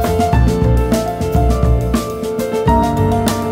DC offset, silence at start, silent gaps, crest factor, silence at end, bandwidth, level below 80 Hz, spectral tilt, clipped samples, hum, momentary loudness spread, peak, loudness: under 0.1%; 0 s; none; 14 dB; 0 s; 16.5 kHz; -20 dBFS; -7 dB/octave; under 0.1%; none; 5 LU; 0 dBFS; -15 LUFS